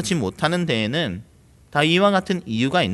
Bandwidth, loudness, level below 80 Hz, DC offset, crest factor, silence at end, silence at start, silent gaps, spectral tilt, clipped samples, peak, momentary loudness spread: 12 kHz; -21 LUFS; -54 dBFS; under 0.1%; 18 dB; 0 s; 0 s; none; -5 dB/octave; under 0.1%; -4 dBFS; 9 LU